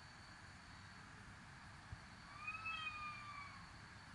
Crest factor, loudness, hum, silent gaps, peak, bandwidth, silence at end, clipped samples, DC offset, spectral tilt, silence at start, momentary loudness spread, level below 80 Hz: 16 dB; -52 LUFS; none; none; -36 dBFS; 11.5 kHz; 0 s; under 0.1%; under 0.1%; -3.5 dB/octave; 0 s; 13 LU; -68 dBFS